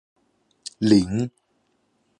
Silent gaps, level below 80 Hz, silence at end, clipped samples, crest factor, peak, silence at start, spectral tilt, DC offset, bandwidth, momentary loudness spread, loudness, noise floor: none; -52 dBFS; 0.9 s; under 0.1%; 22 dB; -4 dBFS; 0.8 s; -6.5 dB/octave; under 0.1%; 10.5 kHz; 21 LU; -21 LUFS; -69 dBFS